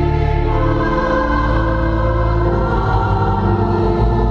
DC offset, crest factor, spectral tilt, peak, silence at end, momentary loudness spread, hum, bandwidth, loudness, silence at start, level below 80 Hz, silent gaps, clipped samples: under 0.1%; 12 dB; -9 dB/octave; -2 dBFS; 0 s; 1 LU; none; 6.4 kHz; -16 LUFS; 0 s; -20 dBFS; none; under 0.1%